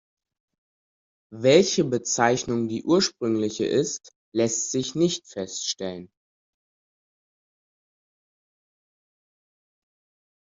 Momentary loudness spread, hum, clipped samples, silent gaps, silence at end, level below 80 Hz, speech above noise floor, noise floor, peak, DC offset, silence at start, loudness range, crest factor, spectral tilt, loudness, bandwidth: 13 LU; none; under 0.1%; 4.16-4.32 s; 4.35 s; -66 dBFS; over 66 dB; under -90 dBFS; -4 dBFS; under 0.1%; 1.3 s; 13 LU; 24 dB; -4 dB/octave; -24 LUFS; 7.8 kHz